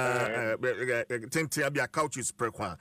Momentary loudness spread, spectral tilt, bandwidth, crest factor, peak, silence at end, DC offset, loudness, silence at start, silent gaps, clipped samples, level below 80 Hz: 3 LU; -4 dB/octave; 15.5 kHz; 14 dB; -18 dBFS; 0.05 s; under 0.1%; -30 LUFS; 0 s; none; under 0.1%; -64 dBFS